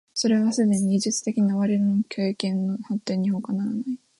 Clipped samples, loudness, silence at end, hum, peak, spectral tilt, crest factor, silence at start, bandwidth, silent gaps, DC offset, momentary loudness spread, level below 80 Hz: under 0.1%; -24 LUFS; 0.25 s; none; -8 dBFS; -5.5 dB/octave; 14 dB; 0.15 s; 11.5 kHz; none; under 0.1%; 6 LU; -68 dBFS